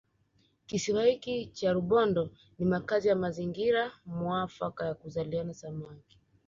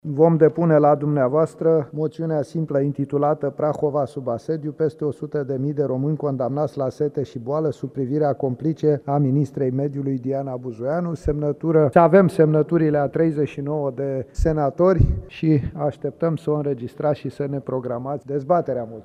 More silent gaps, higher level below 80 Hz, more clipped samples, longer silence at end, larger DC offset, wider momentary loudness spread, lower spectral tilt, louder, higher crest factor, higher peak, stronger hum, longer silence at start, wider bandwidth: neither; second, -62 dBFS vs -38 dBFS; neither; first, 0.5 s vs 0.05 s; neither; about the same, 12 LU vs 10 LU; second, -6 dB/octave vs -9.5 dB/octave; second, -31 LUFS vs -21 LUFS; about the same, 16 dB vs 20 dB; second, -14 dBFS vs -2 dBFS; neither; first, 0.7 s vs 0.05 s; second, 7.6 kHz vs 10.5 kHz